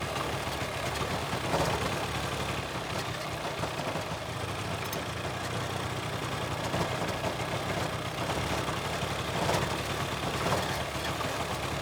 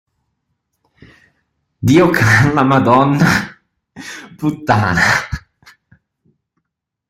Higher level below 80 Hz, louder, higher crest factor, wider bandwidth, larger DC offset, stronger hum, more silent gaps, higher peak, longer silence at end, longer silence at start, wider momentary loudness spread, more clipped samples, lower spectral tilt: second, -48 dBFS vs -42 dBFS; second, -32 LUFS vs -13 LUFS; about the same, 18 dB vs 16 dB; first, over 20 kHz vs 16 kHz; neither; neither; neither; second, -14 dBFS vs 0 dBFS; second, 0 s vs 1.7 s; second, 0 s vs 1.8 s; second, 4 LU vs 20 LU; neither; second, -4 dB/octave vs -6 dB/octave